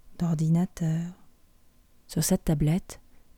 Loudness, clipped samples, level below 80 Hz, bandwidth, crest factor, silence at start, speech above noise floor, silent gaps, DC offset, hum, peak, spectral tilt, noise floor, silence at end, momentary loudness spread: -27 LUFS; under 0.1%; -46 dBFS; 17.5 kHz; 16 dB; 0.05 s; 32 dB; none; under 0.1%; none; -12 dBFS; -6 dB/octave; -58 dBFS; 0.4 s; 14 LU